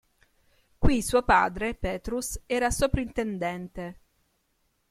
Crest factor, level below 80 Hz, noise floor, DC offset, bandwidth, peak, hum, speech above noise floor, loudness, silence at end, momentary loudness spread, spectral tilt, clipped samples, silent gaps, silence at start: 20 dB; -38 dBFS; -72 dBFS; under 0.1%; 15.5 kHz; -8 dBFS; none; 46 dB; -27 LUFS; 1 s; 13 LU; -4.5 dB/octave; under 0.1%; none; 0.8 s